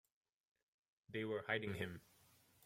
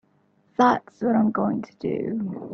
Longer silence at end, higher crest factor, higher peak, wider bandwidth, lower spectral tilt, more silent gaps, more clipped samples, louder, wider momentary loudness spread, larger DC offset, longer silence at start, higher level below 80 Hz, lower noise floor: first, 0.65 s vs 0 s; first, 24 dB vs 18 dB; second, -26 dBFS vs -6 dBFS; first, 16.5 kHz vs 6.6 kHz; second, -6 dB/octave vs -7.5 dB/octave; neither; neither; second, -44 LUFS vs -24 LUFS; about the same, 9 LU vs 9 LU; neither; first, 1.1 s vs 0.6 s; second, -80 dBFS vs -64 dBFS; first, -72 dBFS vs -63 dBFS